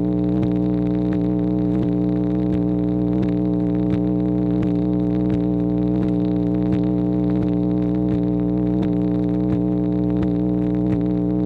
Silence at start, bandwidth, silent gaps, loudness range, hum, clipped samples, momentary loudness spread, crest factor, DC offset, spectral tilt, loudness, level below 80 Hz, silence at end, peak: 0 s; 4.5 kHz; none; 0 LU; 60 Hz at -30 dBFS; under 0.1%; 0 LU; 12 dB; under 0.1%; -11.5 dB/octave; -20 LUFS; -36 dBFS; 0 s; -8 dBFS